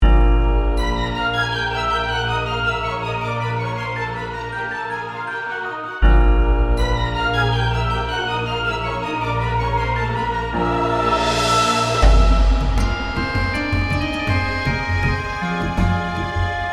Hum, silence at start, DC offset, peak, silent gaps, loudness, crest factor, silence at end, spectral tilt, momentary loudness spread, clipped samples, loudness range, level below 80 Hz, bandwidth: none; 0 s; under 0.1%; 0 dBFS; none; -20 LUFS; 18 dB; 0 s; -5.5 dB/octave; 9 LU; under 0.1%; 5 LU; -22 dBFS; 11.5 kHz